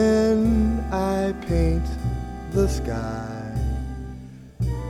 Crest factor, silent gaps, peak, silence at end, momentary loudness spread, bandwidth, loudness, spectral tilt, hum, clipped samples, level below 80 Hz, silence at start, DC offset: 14 dB; none; -8 dBFS; 0 s; 14 LU; 13.5 kHz; -24 LUFS; -7.5 dB/octave; none; under 0.1%; -28 dBFS; 0 s; under 0.1%